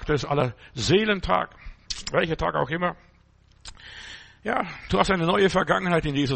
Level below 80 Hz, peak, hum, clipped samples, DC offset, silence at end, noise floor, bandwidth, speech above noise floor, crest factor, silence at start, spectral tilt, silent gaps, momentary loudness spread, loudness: -42 dBFS; -6 dBFS; none; under 0.1%; under 0.1%; 0 s; -57 dBFS; 8.8 kHz; 33 dB; 20 dB; 0 s; -5 dB/octave; none; 19 LU; -24 LUFS